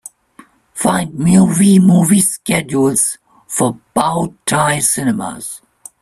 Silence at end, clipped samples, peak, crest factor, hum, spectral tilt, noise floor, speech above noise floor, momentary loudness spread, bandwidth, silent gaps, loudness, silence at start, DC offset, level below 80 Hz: 0.45 s; under 0.1%; 0 dBFS; 14 dB; none; -5 dB/octave; -46 dBFS; 32 dB; 15 LU; 14 kHz; none; -13 LUFS; 0.75 s; under 0.1%; -48 dBFS